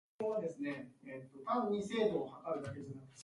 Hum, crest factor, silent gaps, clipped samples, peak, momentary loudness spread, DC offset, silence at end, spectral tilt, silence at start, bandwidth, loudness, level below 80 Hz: none; 18 dB; none; under 0.1%; -22 dBFS; 15 LU; under 0.1%; 0 s; -6 dB/octave; 0.2 s; 11.5 kHz; -39 LUFS; -74 dBFS